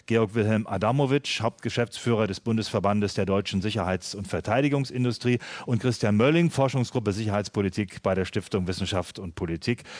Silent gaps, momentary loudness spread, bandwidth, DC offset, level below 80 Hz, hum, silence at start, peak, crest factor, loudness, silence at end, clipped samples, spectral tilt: none; 6 LU; 11 kHz; under 0.1%; -54 dBFS; none; 0.1 s; -8 dBFS; 18 dB; -26 LUFS; 0 s; under 0.1%; -6 dB/octave